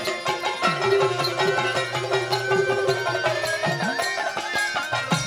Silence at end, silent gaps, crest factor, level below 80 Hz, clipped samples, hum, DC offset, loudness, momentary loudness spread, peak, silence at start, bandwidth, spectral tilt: 0 s; none; 16 dB; -62 dBFS; under 0.1%; none; under 0.1%; -23 LUFS; 4 LU; -8 dBFS; 0 s; 16 kHz; -3.5 dB/octave